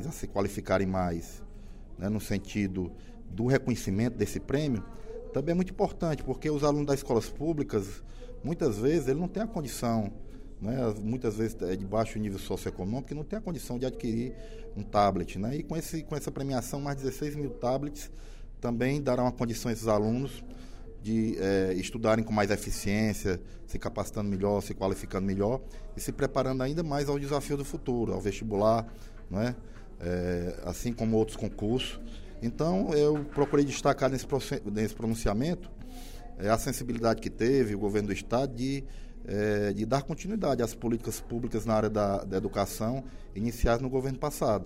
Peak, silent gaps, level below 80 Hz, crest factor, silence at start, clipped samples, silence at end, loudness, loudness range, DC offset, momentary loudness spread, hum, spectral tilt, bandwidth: -12 dBFS; none; -42 dBFS; 18 dB; 0 s; under 0.1%; 0 s; -31 LUFS; 3 LU; under 0.1%; 12 LU; none; -6 dB/octave; 16 kHz